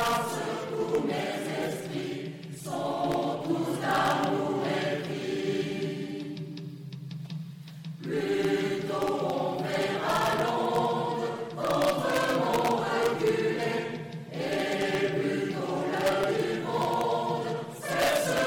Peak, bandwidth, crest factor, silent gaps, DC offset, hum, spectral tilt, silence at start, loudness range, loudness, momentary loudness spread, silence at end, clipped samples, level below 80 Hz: -14 dBFS; 18 kHz; 16 dB; none; under 0.1%; none; -5 dB/octave; 0 s; 5 LU; -29 LUFS; 12 LU; 0 s; under 0.1%; -64 dBFS